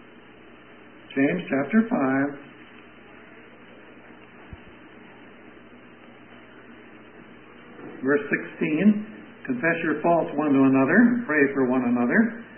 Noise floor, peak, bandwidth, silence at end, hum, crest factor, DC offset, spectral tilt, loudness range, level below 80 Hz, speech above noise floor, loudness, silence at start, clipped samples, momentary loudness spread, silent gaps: -49 dBFS; -6 dBFS; 3.3 kHz; 0 s; none; 18 dB; 0.2%; -11.5 dB/octave; 24 LU; -64 dBFS; 27 dB; -22 LUFS; 1.1 s; under 0.1%; 23 LU; none